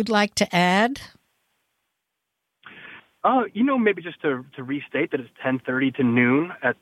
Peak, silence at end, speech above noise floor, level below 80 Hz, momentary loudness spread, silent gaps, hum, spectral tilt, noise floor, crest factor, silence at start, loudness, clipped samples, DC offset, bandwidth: -6 dBFS; 0.1 s; 58 dB; -64 dBFS; 12 LU; none; none; -5 dB/octave; -80 dBFS; 18 dB; 0 s; -22 LUFS; under 0.1%; under 0.1%; 14 kHz